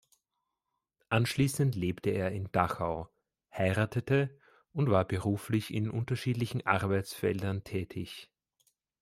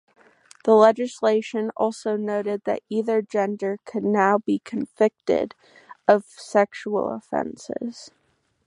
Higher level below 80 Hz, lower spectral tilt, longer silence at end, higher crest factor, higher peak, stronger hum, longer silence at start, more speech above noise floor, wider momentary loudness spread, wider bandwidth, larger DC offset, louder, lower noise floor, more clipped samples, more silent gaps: first, -62 dBFS vs -68 dBFS; about the same, -6.5 dB/octave vs -6 dB/octave; first, 0.75 s vs 0.6 s; about the same, 22 dB vs 22 dB; second, -10 dBFS vs -2 dBFS; neither; first, 1.1 s vs 0.65 s; first, 55 dB vs 28 dB; about the same, 11 LU vs 11 LU; first, 16 kHz vs 11 kHz; neither; second, -32 LUFS vs -23 LUFS; first, -86 dBFS vs -50 dBFS; neither; neither